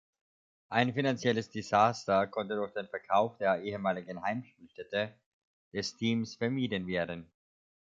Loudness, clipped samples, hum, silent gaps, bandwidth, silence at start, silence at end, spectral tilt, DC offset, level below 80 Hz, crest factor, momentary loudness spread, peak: -32 LUFS; under 0.1%; none; 5.26-5.71 s; 7.8 kHz; 0.7 s; 0.65 s; -5.5 dB/octave; under 0.1%; -66 dBFS; 22 dB; 12 LU; -10 dBFS